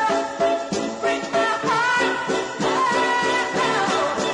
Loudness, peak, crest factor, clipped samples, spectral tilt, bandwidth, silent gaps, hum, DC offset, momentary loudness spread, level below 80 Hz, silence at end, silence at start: -21 LUFS; -8 dBFS; 14 dB; under 0.1%; -3 dB/octave; 11 kHz; none; none; under 0.1%; 5 LU; -58 dBFS; 0 s; 0 s